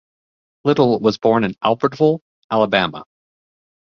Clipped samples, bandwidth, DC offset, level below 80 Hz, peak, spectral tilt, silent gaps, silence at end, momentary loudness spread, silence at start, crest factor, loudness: under 0.1%; 6.8 kHz; under 0.1%; -56 dBFS; -2 dBFS; -7 dB/octave; 2.21-2.49 s; 0.95 s; 8 LU; 0.65 s; 18 dB; -18 LUFS